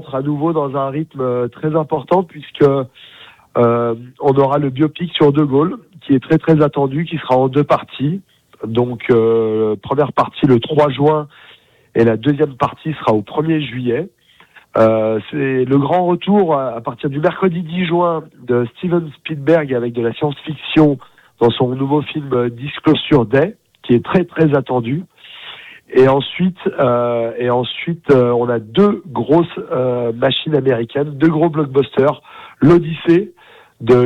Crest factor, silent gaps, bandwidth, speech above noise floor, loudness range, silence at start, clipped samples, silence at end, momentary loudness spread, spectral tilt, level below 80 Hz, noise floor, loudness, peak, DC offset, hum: 14 dB; none; 7.4 kHz; 32 dB; 3 LU; 0 s; under 0.1%; 0 s; 9 LU; -9 dB/octave; -52 dBFS; -47 dBFS; -16 LUFS; -2 dBFS; under 0.1%; none